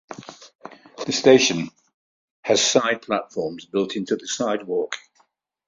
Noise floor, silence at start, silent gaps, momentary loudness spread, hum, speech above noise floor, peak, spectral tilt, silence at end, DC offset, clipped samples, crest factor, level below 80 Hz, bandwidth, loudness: -65 dBFS; 0.1 s; 0.55-0.59 s, 1.94-2.43 s; 23 LU; none; 44 dB; -2 dBFS; -3 dB/octave; 0.7 s; under 0.1%; under 0.1%; 22 dB; -64 dBFS; 7.8 kHz; -21 LUFS